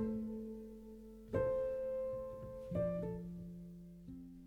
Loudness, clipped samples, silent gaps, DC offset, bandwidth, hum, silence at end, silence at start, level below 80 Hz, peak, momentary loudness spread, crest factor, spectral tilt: -42 LUFS; under 0.1%; none; under 0.1%; 15.5 kHz; none; 0 s; 0 s; -58 dBFS; -24 dBFS; 16 LU; 18 dB; -9.5 dB/octave